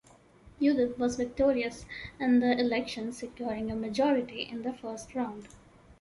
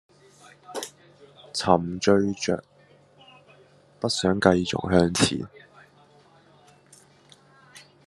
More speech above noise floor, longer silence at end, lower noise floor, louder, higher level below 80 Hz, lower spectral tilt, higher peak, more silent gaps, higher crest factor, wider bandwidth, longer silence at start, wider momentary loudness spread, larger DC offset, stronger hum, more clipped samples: second, 27 dB vs 34 dB; second, 0.05 s vs 0.25 s; about the same, -57 dBFS vs -56 dBFS; second, -30 LUFS vs -24 LUFS; first, -56 dBFS vs -62 dBFS; about the same, -5 dB/octave vs -4.5 dB/octave; second, -12 dBFS vs -2 dBFS; neither; second, 18 dB vs 26 dB; about the same, 11.5 kHz vs 12.5 kHz; second, 0.45 s vs 0.7 s; second, 11 LU vs 15 LU; neither; neither; neither